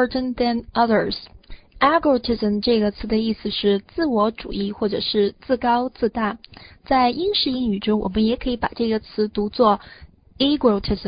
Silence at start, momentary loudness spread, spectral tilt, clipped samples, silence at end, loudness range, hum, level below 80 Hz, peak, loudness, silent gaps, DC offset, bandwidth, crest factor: 0 s; 6 LU; -10.5 dB/octave; under 0.1%; 0 s; 1 LU; none; -42 dBFS; -4 dBFS; -21 LUFS; none; under 0.1%; 5.2 kHz; 18 dB